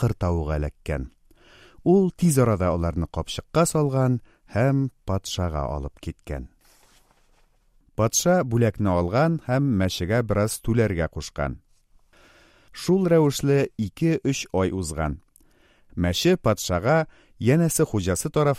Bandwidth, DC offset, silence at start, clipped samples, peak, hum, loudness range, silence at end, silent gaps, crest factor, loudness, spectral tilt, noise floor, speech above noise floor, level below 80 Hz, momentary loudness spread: 15.5 kHz; under 0.1%; 0 s; under 0.1%; -6 dBFS; none; 5 LU; 0 s; none; 18 dB; -23 LUFS; -5.5 dB/octave; -60 dBFS; 38 dB; -40 dBFS; 12 LU